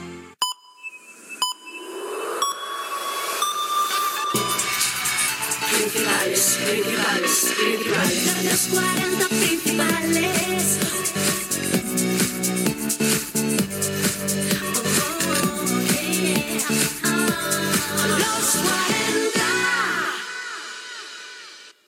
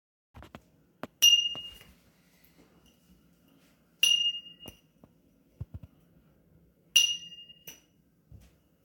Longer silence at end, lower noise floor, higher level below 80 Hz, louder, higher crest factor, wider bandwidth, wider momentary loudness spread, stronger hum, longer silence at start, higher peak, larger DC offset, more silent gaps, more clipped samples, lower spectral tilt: second, 0.15 s vs 1.1 s; second, -43 dBFS vs -67 dBFS; about the same, -58 dBFS vs -62 dBFS; first, -21 LUFS vs -24 LUFS; second, 16 dB vs 26 dB; about the same, 19 kHz vs 19 kHz; second, 12 LU vs 28 LU; neither; second, 0 s vs 0.35 s; about the same, -6 dBFS vs -8 dBFS; neither; neither; neither; first, -2.5 dB/octave vs 1.5 dB/octave